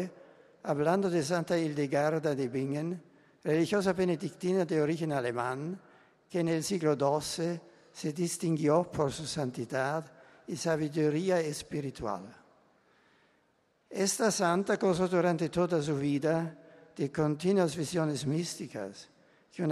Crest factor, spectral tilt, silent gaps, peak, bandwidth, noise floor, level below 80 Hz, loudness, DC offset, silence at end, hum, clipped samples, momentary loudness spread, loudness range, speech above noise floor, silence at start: 18 dB; -5.5 dB/octave; none; -12 dBFS; 13 kHz; -71 dBFS; -66 dBFS; -31 LUFS; under 0.1%; 0 s; none; under 0.1%; 12 LU; 4 LU; 41 dB; 0 s